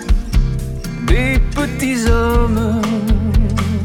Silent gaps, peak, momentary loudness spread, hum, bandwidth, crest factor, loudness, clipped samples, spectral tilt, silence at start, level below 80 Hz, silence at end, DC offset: none; 0 dBFS; 6 LU; none; 16 kHz; 14 dB; -17 LUFS; under 0.1%; -6 dB/octave; 0 s; -18 dBFS; 0 s; under 0.1%